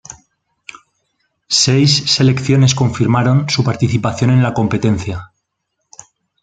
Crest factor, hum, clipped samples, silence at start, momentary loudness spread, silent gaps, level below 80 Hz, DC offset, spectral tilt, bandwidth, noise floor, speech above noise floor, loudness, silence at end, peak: 16 dB; none; under 0.1%; 0.1 s; 5 LU; none; -46 dBFS; under 0.1%; -5 dB/octave; 9.2 kHz; -72 dBFS; 59 dB; -13 LUFS; 1.2 s; 0 dBFS